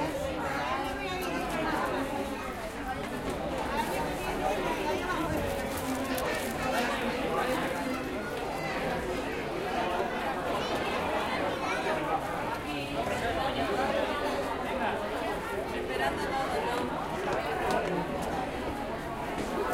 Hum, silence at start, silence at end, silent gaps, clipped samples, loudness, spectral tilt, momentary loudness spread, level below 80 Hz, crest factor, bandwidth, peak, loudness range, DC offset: none; 0 s; 0 s; none; under 0.1%; -32 LUFS; -4.5 dB/octave; 5 LU; -48 dBFS; 16 dB; 16.5 kHz; -16 dBFS; 2 LU; under 0.1%